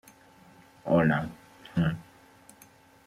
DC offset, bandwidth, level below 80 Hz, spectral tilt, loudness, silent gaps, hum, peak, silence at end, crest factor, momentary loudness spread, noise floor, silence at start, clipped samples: under 0.1%; 13.5 kHz; -58 dBFS; -8 dB/octave; -28 LUFS; none; none; -10 dBFS; 1.05 s; 20 dB; 18 LU; -57 dBFS; 0.85 s; under 0.1%